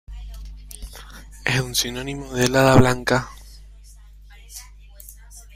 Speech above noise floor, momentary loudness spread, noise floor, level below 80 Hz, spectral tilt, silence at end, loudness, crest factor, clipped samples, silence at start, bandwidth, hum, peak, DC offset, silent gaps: 26 dB; 26 LU; -44 dBFS; -38 dBFS; -4.5 dB/octave; 0.15 s; -19 LUFS; 22 dB; under 0.1%; 0.1 s; 16 kHz; 50 Hz at -40 dBFS; 0 dBFS; under 0.1%; none